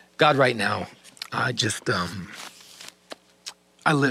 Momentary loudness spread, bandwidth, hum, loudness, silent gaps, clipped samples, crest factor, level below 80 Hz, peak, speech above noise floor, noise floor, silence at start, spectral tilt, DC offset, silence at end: 22 LU; 15.5 kHz; none; -24 LUFS; none; under 0.1%; 22 dB; -66 dBFS; -4 dBFS; 23 dB; -47 dBFS; 0.2 s; -4 dB/octave; under 0.1%; 0 s